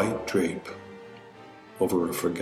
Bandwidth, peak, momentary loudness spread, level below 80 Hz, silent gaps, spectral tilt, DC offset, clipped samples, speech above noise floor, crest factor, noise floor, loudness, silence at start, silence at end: 16 kHz; -12 dBFS; 21 LU; -60 dBFS; none; -5.5 dB/octave; under 0.1%; under 0.1%; 21 dB; 18 dB; -48 dBFS; -28 LUFS; 0 s; 0 s